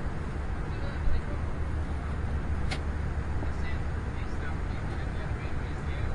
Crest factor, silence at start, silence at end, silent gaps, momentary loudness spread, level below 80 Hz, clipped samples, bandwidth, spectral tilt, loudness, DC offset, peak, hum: 14 dB; 0 s; 0 s; none; 2 LU; -34 dBFS; under 0.1%; 10.5 kHz; -7 dB/octave; -34 LUFS; under 0.1%; -16 dBFS; none